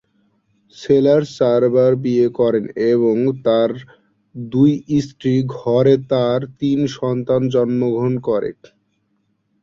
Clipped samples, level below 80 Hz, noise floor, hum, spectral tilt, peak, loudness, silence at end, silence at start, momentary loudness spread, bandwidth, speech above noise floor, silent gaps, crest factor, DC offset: under 0.1%; -56 dBFS; -66 dBFS; none; -8 dB/octave; -2 dBFS; -17 LUFS; 1.1 s; 0.8 s; 7 LU; 7.4 kHz; 50 dB; none; 16 dB; under 0.1%